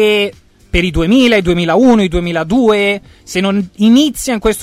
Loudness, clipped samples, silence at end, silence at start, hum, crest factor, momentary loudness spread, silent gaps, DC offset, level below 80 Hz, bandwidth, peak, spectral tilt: -12 LUFS; under 0.1%; 0 s; 0 s; none; 10 dB; 8 LU; none; under 0.1%; -28 dBFS; 16 kHz; 0 dBFS; -5 dB/octave